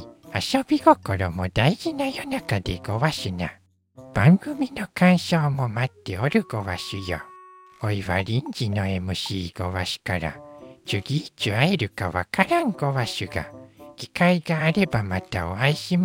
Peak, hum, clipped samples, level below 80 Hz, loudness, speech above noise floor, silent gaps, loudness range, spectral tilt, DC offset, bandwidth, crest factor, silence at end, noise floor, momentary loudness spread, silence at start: -2 dBFS; none; under 0.1%; -48 dBFS; -24 LUFS; 25 dB; none; 5 LU; -6 dB/octave; under 0.1%; 16.5 kHz; 22 dB; 0 s; -48 dBFS; 12 LU; 0 s